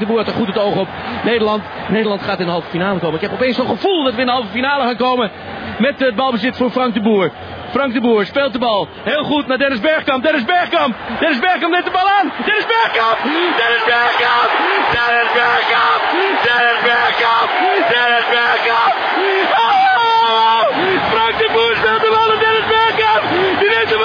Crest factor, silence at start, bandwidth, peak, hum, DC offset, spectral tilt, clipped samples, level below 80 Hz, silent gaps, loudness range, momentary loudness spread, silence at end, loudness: 12 dB; 0 s; 5.4 kHz; -2 dBFS; none; under 0.1%; -6 dB/octave; under 0.1%; -50 dBFS; none; 4 LU; 6 LU; 0 s; -14 LUFS